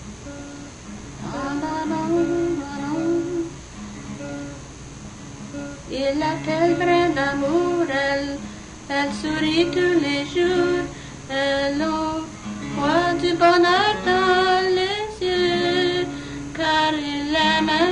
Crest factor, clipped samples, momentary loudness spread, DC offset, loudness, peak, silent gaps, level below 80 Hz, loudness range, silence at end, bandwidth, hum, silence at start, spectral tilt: 18 dB; under 0.1%; 18 LU; under 0.1%; -21 LUFS; -4 dBFS; none; -46 dBFS; 8 LU; 0 s; 10.5 kHz; none; 0 s; -4.5 dB/octave